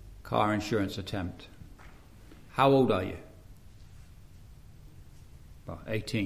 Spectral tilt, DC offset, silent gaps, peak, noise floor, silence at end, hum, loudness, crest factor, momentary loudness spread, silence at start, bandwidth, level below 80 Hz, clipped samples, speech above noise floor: -6.5 dB/octave; 0.1%; none; -10 dBFS; -52 dBFS; 0 s; none; -29 LUFS; 24 dB; 25 LU; 0.05 s; 15.5 kHz; -52 dBFS; under 0.1%; 24 dB